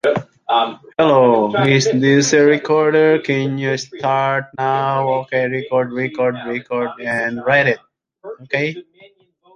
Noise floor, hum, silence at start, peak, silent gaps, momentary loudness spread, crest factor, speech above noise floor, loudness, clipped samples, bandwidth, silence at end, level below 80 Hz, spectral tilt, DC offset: -52 dBFS; none; 0.05 s; 0 dBFS; none; 10 LU; 16 dB; 36 dB; -16 LUFS; under 0.1%; 9.8 kHz; 0.75 s; -60 dBFS; -5 dB/octave; under 0.1%